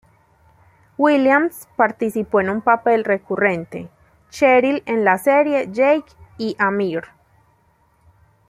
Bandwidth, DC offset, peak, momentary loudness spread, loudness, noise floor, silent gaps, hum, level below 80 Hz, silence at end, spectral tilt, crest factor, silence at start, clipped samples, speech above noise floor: 16 kHz; under 0.1%; -2 dBFS; 12 LU; -18 LUFS; -59 dBFS; none; none; -60 dBFS; 1.45 s; -6 dB/octave; 18 dB; 1 s; under 0.1%; 42 dB